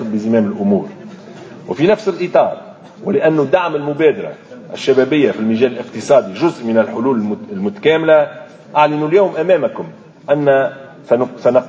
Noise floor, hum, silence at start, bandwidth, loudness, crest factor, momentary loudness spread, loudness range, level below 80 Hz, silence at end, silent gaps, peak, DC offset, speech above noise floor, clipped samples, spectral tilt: -34 dBFS; none; 0 s; 8 kHz; -15 LUFS; 14 dB; 18 LU; 2 LU; -60 dBFS; 0 s; none; 0 dBFS; under 0.1%; 20 dB; under 0.1%; -7 dB/octave